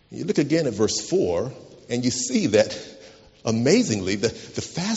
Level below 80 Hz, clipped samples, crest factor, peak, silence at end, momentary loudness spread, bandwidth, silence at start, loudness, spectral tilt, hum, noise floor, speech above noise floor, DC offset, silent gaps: -56 dBFS; under 0.1%; 20 dB; -4 dBFS; 0 s; 12 LU; 8 kHz; 0.1 s; -23 LUFS; -5 dB/octave; none; -48 dBFS; 25 dB; under 0.1%; none